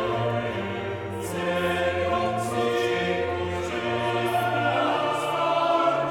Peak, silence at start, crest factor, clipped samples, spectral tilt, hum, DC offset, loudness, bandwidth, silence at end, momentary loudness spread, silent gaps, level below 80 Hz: -10 dBFS; 0 s; 14 dB; under 0.1%; -5.5 dB/octave; none; under 0.1%; -25 LUFS; 18.5 kHz; 0 s; 7 LU; none; -54 dBFS